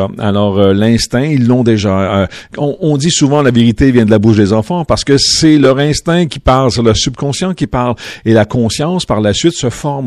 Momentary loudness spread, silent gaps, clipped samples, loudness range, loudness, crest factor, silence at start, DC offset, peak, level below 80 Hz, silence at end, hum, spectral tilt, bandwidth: 7 LU; none; 0.9%; 3 LU; -11 LUFS; 10 dB; 0 s; under 0.1%; 0 dBFS; -32 dBFS; 0 s; none; -5.5 dB/octave; 12.5 kHz